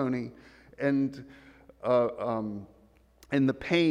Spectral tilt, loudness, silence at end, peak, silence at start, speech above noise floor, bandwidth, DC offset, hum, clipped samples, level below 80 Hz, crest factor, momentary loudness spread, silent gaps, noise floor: -7 dB/octave; -29 LUFS; 0 s; -12 dBFS; 0 s; 31 dB; 9.8 kHz; under 0.1%; none; under 0.1%; -62 dBFS; 18 dB; 16 LU; none; -59 dBFS